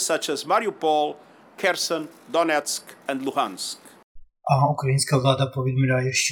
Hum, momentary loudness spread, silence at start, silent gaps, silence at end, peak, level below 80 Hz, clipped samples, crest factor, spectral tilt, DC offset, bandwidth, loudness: none; 10 LU; 0 s; 4.04-4.15 s; 0 s; -4 dBFS; -60 dBFS; under 0.1%; 20 dB; -4.5 dB/octave; under 0.1%; 18.5 kHz; -23 LUFS